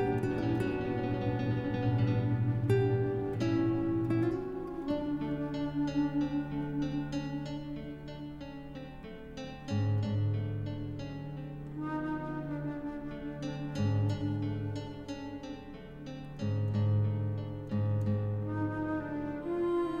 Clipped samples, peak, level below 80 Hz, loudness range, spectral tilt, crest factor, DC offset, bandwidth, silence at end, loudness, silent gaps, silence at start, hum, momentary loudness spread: under 0.1%; -18 dBFS; -52 dBFS; 7 LU; -8.5 dB/octave; 16 dB; under 0.1%; 7.4 kHz; 0 s; -34 LUFS; none; 0 s; none; 13 LU